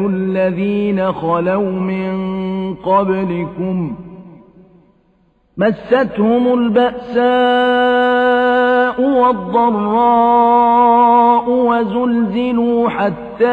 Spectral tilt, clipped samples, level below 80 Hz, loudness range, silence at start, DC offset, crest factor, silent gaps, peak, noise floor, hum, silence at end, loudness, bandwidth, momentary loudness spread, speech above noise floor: -8.5 dB/octave; under 0.1%; -50 dBFS; 8 LU; 0 s; under 0.1%; 12 dB; none; -2 dBFS; -56 dBFS; none; 0 s; -14 LUFS; 4.8 kHz; 10 LU; 42 dB